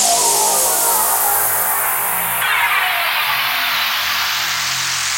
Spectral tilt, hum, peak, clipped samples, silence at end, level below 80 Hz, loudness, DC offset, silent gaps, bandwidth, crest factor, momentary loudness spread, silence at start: 1 dB/octave; none; -2 dBFS; under 0.1%; 0 s; -54 dBFS; -14 LUFS; under 0.1%; none; 16.5 kHz; 14 dB; 4 LU; 0 s